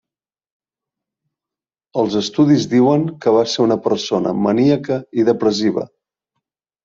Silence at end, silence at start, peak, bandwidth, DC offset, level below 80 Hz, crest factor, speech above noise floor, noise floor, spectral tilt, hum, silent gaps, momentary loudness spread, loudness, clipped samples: 1 s; 1.95 s; -2 dBFS; 7.6 kHz; under 0.1%; -58 dBFS; 16 dB; 74 dB; -89 dBFS; -6 dB/octave; none; none; 7 LU; -16 LUFS; under 0.1%